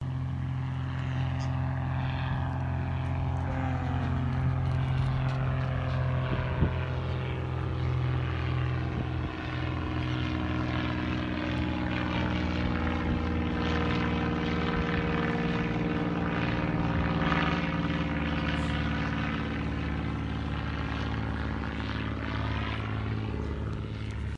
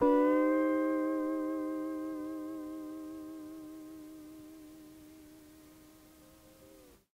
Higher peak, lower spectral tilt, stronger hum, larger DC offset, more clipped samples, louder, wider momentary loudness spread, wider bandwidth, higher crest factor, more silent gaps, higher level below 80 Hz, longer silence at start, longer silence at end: first, -12 dBFS vs -16 dBFS; first, -7.5 dB/octave vs -6 dB/octave; neither; neither; neither; about the same, -31 LUFS vs -33 LUFS; second, 4 LU vs 26 LU; second, 7.4 kHz vs 16 kHz; about the same, 18 dB vs 18 dB; neither; first, -40 dBFS vs -70 dBFS; about the same, 0 s vs 0 s; second, 0 s vs 0.4 s